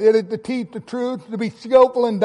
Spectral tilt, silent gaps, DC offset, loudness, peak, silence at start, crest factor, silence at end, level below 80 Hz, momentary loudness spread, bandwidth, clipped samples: -6.5 dB/octave; none; under 0.1%; -20 LUFS; -4 dBFS; 0 s; 16 dB; 0 s; -62 dBFS; 12 LU; 10 kHz; under 0.1%